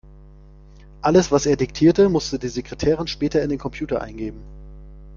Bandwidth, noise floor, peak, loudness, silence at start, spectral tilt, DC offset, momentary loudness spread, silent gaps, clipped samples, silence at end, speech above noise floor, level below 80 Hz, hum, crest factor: 7.4 kHz; -45 dBFS; -2 dBFS; -20 LUFS; 1.05 s; -6 dB/octave; under 0.1%; 13 LU; none; under 0.1%; 0 s; 25 dB; -40 dBFS; 50 Hz at -40 dBFS; 18 dB